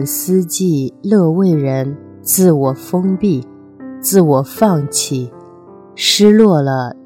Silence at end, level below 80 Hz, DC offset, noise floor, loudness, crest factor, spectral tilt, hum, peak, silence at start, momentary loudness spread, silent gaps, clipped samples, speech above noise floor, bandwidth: 0.1 s; -56 dBFS; under 0.1%; -38 dBFS; -13 LUFS; 14 dB; -5 dB/octave; none; 0 dBFS; 0 s; 10 LU; none; under 0.1%; 26 dB; 16.5 kHz